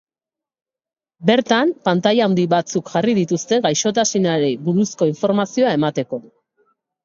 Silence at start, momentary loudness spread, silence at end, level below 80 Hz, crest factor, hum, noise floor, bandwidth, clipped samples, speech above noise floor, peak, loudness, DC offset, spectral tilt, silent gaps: 1.2 s; 5 LU; 0.85 s; -64 dBFS; 18 dB; none; -89 dBFS; 7.6 kHz; under 0.1%; 72 dB; -2 dBFS; -18 LUFS; under 0.1%; -5 dB/octave; none